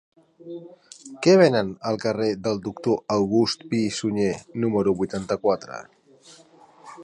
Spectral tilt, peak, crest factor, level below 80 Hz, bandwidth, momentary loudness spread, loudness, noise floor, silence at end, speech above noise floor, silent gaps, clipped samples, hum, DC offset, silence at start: -5.5 dB/octave; -4 dBFS; 20 dB; -58 dBFS; 11 kHz; 21 LU; -23 LUFS; -52 dBFS; 0 s; 29 dB; none; under 0.1%; none; under 0.1%; 0.45 s